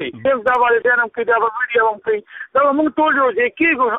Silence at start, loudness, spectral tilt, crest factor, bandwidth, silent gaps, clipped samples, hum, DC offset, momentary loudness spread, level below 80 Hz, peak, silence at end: 0 s; -16 LUFS; -6.5 dB/octave; 12 dB; 4 kHz; none; under 0.1%; none; under 0.1%; 5 LU; -56 dBFS; -4 dBFS; 0 s